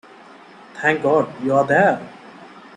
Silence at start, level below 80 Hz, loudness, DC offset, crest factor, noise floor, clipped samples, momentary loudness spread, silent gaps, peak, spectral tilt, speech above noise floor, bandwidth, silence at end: 0.75 s; -62 dBFS; -18 LUFS; under 0.1%; 18 dB; -44 dBFS; under 0.1%; 17 LU; none; -4 dBFS; -6.5 dB/octave; 26 dB; 10.5 kHz; 0.15 s